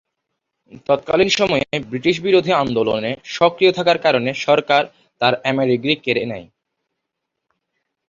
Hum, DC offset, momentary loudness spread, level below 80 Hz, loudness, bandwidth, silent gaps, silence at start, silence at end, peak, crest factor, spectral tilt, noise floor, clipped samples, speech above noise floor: none; under 0.1%; 8 LU; -54 dBFS; -17 LUFS; 7.6 kHz; none; 0.9 s; 1.65 s; 0 dBFS; 18 dB; -5 dB/octave; -79 dBFS; under 0.1%; 61 dB